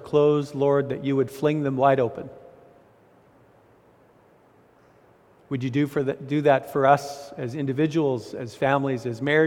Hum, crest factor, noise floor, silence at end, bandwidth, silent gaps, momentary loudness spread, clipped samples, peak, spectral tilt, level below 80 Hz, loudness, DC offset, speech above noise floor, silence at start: none; 20 dB; -57 dBFS; 0 s; 16 kHz; none; 12 LU; under 0.1%; -4 dBFS; -7 dB/octave; -64 dBFS; -24 LUFS; under 0.1%; 34 dB; 0 s